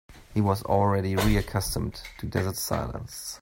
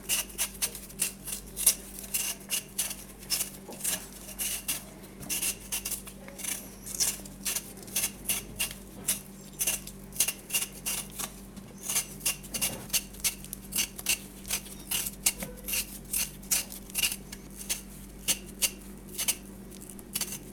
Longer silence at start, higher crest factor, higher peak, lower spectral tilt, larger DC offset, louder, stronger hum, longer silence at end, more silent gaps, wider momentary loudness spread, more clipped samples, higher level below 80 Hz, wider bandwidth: about the same, 0.1 s vs 0 s; second, 18 dB vs 30 dB; second, -8 dBFS vs -4 dBFS; first, -5.5 dB/octave vs -0.5 dB/octave; neither; first, -27 LUFS vs -31 LUFS; neither; about the same, 0.05 s vs 0 s; neither; about the same, 11 LU vs 10 LU; neither; first, -38 dBFS vs -52 dBFS; second, 16.5 kHz vs over 20 kHz